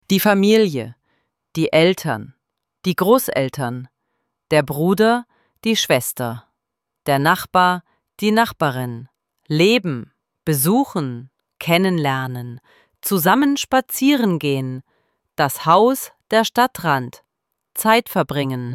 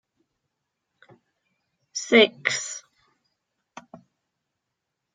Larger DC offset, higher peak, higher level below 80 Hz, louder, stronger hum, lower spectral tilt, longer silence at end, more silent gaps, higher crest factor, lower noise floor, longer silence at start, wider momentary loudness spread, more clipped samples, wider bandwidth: neither; about the same, -2 dBFS vs -4 dBFS; first, -58 dBFS vs -82 dBFS; first, -18 LUFS vs -21 LUFS; neither; first, -5 dB/octave vs -2 dB/octave; second, 0 s vs 2.35 s; neither; second, 18 dB vs 26 dB; about the same, -81 dBFS vs -82 dBFS; second, 0.1 s vs 1.95 s; second, 14 LU vs 18 LU; neither; first, 17.5 kHz vs 9.6 kHz